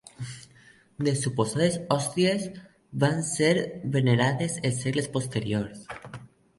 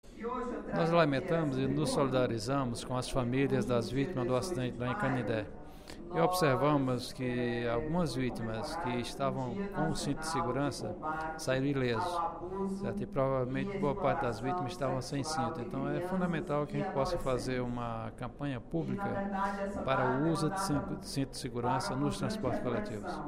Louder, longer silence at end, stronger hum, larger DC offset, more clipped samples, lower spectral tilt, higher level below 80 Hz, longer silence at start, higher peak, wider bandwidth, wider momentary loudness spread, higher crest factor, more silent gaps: first, -26 LUFS vs -34 LUFS; first, 0.3 s vs 0 s; neither; neither; neither; about the same, -5 dB/octave vs -6 dB/octave; second, -60 dBFS vs -50 dBFS; first, 0.2 s vs 0.05 s; first, -8 dBFS vs -14 dBFS; second, 11.5 kHz vs 16 kHz; first, 16 LU vs 7 LU; about the same, 20 dB vs 18 dB; neither